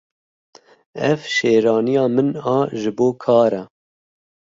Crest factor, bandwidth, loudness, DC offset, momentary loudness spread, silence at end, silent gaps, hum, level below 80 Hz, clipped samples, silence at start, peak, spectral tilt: 18 dB; 7.8 kHz; -18 LUFS; under 0.1%; 7 LU; 0.85 s; none; none; -62 dBFS; under 0.1%; 0.95 s; -2 dBFS; -6 dB/octave